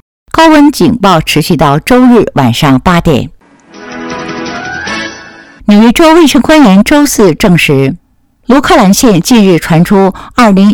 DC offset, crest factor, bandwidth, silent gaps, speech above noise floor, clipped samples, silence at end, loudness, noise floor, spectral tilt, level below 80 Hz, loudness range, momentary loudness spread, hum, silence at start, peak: under 0.1%; 6 dB; 18.5 kHz; none; 28 dB; 6%; 0 s; -6 LUFS; -32 dBFS; -5.5 dB/octave; -30 dBFS; 6 LU; 14 LU; none; 0.35 s; 0 dBFS